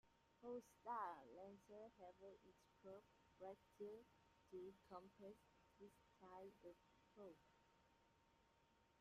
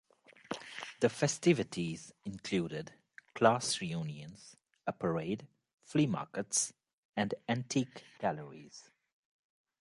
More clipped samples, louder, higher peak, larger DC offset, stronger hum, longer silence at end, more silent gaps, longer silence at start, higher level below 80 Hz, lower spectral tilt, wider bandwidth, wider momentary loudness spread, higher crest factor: neither; second, -60 LUFS vs -35 LUFS; second, -40 dBFS vs -12 dBFS; neither; neither; second, 0 s vs 1 s; second, none vs 5.74-5.78 s, 6.93-7.13 s; second, 0.05 s vs 0.5 s; second, -88 dBFS vs -70 dBFS; first, -6 dB/octave vs -4.5 dB/octave; first, 13 kHz vs 11.5 kHz; second, 13 LU vs 18 LU; about the same, 22 dB vs 24 dB